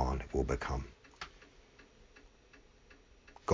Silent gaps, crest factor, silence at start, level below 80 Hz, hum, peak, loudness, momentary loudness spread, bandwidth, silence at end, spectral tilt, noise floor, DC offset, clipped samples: none; 24 dB; 0 s; -46 dBFS; none; -16 dBFS; -39 LUFS; 26 LU; 7.6 kHz; 0 s; -6.5 dB/octave; -62 dBFS; under 0.1%; under 0.1%